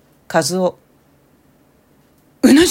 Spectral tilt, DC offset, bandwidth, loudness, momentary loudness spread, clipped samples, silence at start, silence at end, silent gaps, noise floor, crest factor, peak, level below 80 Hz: -4 dB/octave; under 0.1%; 16.5 kHz; -16 LUFS; 9 LU; under 0.1%; 0.3 s; 0 s; none; -54 dBFS; 18 dB; 0 dBFS; -48 dBFS